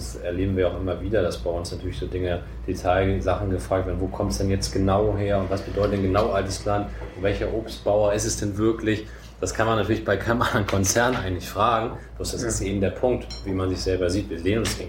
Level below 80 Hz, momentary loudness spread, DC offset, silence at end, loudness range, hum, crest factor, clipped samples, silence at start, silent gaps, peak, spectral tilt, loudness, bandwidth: -36 dBFS; 8 LU; under 0.1%; 0 s; 2 LU; none; 18 dB; under 0.1%; 0 s; none; -6 dBFS; -5 dB/octave; -24 LUFS; 16.5 kHz